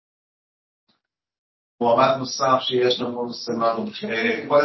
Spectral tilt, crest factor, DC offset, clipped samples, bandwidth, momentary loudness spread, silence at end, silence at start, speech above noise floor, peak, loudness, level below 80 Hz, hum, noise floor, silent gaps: -4.5 dB/octave; 18 dB; under 0.1%; under 0.1%; 6.2 kHz; 9 LU; 0 s; 1.8 s; 51 dB; -4 dBFS; -21 LUFS; -68 dBFS; none; -71 dBFS; none